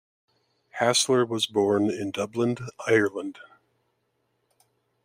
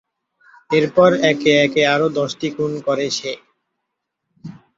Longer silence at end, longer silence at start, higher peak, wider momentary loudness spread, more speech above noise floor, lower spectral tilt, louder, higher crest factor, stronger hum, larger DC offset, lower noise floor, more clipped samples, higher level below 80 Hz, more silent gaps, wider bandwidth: first, 1.65 s vs 0.25 s; about the same, 0.75 s vs 0.7 s; second, -6 dBFS vs -2 dBFS; about the same, 11 LU vs 10 LU; second, 49 dB vs 61 dB; about the same, -3.5 dB/octave vs -4.5 dB/octave; second, -25 LUFS vs -17 LUFS; about the same, 20 dB vs 18 dB; neither; neither; about the same, -74 dBFS vs -77 dBFS; neither; second, -72 dBFS vs -60 dBFS; neither; first, 16 kHz vs 7.8 kHz